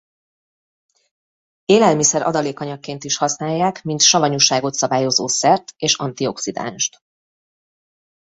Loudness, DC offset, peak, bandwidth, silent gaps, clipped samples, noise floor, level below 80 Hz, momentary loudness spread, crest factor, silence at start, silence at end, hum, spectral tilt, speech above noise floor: -17 LUFS; under 0.1%; 0 dBFS; 8.4 kHz; none; under 0.1%; under -90 dBFS; -62 dBFS; 12 LU; 20 dB; 1.7 s; 1.5 s; none; -2.5 dB/octave; over 72 dB